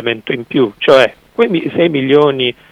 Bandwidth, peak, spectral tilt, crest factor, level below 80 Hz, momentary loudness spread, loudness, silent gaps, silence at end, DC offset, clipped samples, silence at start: 10.5 kHz; 0 dBFS; -6 dB/octave; 12 dB; -54 dBFS; 8 LU; -13 LUFS; none; 0.2 s; under 0.1%; 0.3%; 0 s